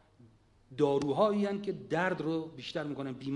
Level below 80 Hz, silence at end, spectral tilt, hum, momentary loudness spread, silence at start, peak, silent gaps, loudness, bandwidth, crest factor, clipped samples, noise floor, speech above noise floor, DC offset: -68 dBFS; 0 s; -6.5 dB/octave; none; 10 LU; 0.7 s; -16 dBFS; none; -32 LUFS; 11 kHz; 18 dB; under 0.1%; -62 dBFS; 30 dB; under 0.1%